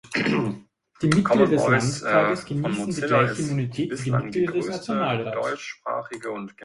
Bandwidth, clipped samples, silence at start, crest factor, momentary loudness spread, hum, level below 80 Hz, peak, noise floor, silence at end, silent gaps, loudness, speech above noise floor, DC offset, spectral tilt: 11.5 kHz; under 0.1%; 0.05 s; 20 dB; 11 LU; none; -58 dBFS; -4 dBFS; -44 dBFS; 0 s; none; -24 LUFS; 21 dB; under 0.1%; -6 dB/octave